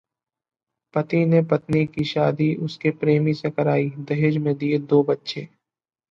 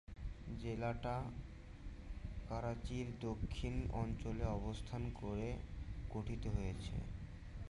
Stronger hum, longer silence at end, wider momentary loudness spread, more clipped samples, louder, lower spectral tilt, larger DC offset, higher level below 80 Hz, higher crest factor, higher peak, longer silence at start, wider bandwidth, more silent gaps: neither; first, 0.65 s vs 0 s; second, 7 LU vs 10 LU; neither; first, -22 LUFS vs -45 LUFS; about the same, -8.5 dB/octave vs -7.5 dB/octave; neither; second, -60 dBFS vs -48 dBFS; about the same, 16 dB vs 18 dB; first, -6 dBFS vs -26 dBFS; first, 0.95 s vs 0.1 s; second, 7.2 kHz vs 11.5 kHz; neither